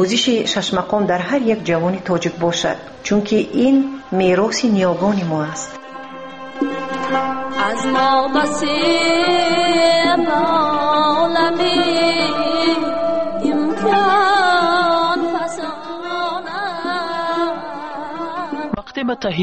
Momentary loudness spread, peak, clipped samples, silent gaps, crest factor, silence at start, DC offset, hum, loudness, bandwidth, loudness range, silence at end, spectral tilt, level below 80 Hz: 11 LU; -4 dBFS; under 0.1%; none; 14 dB; 0 s; 0.9%; none; -17 LUFS; 8.8 kHz; 6 LU; 0 s; -4.5 dB/octave; -52 dBFS